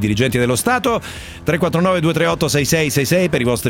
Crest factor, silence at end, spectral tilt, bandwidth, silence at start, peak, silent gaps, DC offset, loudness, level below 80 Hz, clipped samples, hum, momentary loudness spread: 14 dB; 0 s; -5 dB/octave; 17 kHz; 0 s; -2 dBFS; none; under 0.1%; -16 LUFS; -40 dBFS; under 0.1%; none; 5 LU